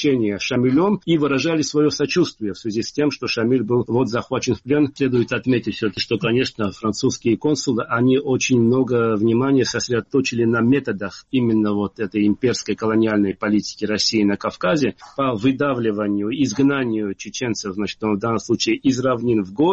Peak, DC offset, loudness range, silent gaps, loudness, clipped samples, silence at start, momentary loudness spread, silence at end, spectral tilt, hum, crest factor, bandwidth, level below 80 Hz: -6 dBFS; under 0.1%; 2 LU; none; -20 LUFS; under 0.1%; 0 s; 6 LU; 0 s; -5.5 dB/octave; none; 14 dB; 8 kHz; -54 dBFS